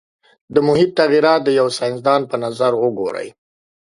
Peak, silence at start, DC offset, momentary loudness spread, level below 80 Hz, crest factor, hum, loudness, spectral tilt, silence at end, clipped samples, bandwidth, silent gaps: 0 dBFS; 0.5 s; under 0.1%; 10 LU; -60 dBFS; 16 dB; none; -16 LUFS; -5.5 dB/octave; 0.65 s; under 0.1%; 11.5 kHz; none